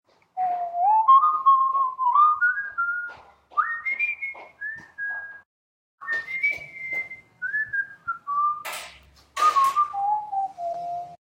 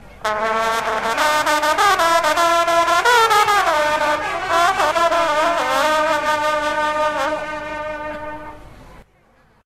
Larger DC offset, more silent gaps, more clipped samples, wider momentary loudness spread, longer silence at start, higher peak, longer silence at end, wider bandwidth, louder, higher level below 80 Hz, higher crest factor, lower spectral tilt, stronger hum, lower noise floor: second, under 0.1% vs 0.2%; first, 5.46-5.98 s vs none; neither; first, 16 LU vs 12 LU; first, 0.35 s vs 0.1 s; second, -8 dBFS vs 0 dBFS; second, 0.1 s vs 0.65 s; about the same, 16 kHz vs 16 kHz; second, -23 LUFS vs -17 LUFS; second, -68 dBFS vs -46 dBFS; about the same, 16 dB vs 18 dB; about the same, -1 dB/octave vs -1.5 dB/octave; neither; second, -50 dBFS vs -55 dBFS